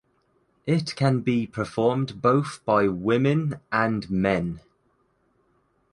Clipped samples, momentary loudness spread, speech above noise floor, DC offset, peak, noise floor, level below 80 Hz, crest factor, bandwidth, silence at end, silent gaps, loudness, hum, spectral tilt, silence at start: under 0.1%; 5 LU; 44 dB; under 0.1%; -6 dBFS; -67 dBFS; -54 dBFS; 18 dB; 11.5 kHz; 1.35 s; none; -24 LUFS; none; -7 dB/octave; 0.65 s